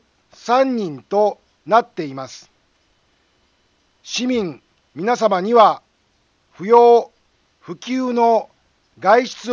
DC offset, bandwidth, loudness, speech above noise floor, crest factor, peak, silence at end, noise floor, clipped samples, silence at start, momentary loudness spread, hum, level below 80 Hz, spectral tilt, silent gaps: under 0.1%; 7.4 kHz; -17 LUFS; 46 dB; 18 dB; 0 dBFS; 0 s; -62 dBFS; under 0.1%; 0.45 s; 19 LU; none; -66 dBFS; -4.5 dB/octave; none